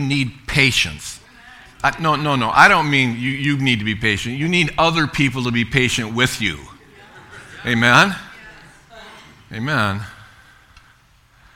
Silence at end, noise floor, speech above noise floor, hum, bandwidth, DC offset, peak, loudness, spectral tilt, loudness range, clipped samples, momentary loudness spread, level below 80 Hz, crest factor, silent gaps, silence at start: 1.3 s; -53 dBFS; 36 dB; none; 17 kHz; under 0.1%; 0 dBFS; -17 LUFS; -4.5 dB/octave; 4 LU; under 0.1%; 19 LU; -44 dBFS; 20 dB; none; 0 s